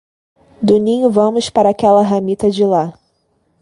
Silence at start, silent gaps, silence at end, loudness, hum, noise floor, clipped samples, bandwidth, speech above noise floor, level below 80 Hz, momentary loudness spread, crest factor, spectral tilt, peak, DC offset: 0.6 s; none; 0.7 s; -13 LUFS; none; -62 dBFS; under 0.1%; 11.5 kHz; 49 dB; -50 dBFS; 6 LU; 14 dB; -6.5 dB/octave; 0 dBFS; under 0.1%